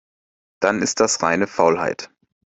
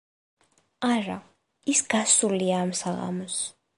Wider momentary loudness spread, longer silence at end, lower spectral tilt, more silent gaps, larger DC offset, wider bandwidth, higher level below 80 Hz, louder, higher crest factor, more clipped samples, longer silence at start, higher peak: about the same, 10 LU vs 12 LU; first, 0.4 s vs 0.25 s; about the same, -3 dB/octave vs -3 dB/octave; neither; neither; second, 8.4 kHz vs 11.5 kHz; first, -58 dBFS vs -70 dBFS; first, -19 LUFS vs -25 LUFS; about the same, 20 dB vs 20 dB; neither; second, 0.6 s vs 0.8 s; first, -2 dBFS vs -8 dBFS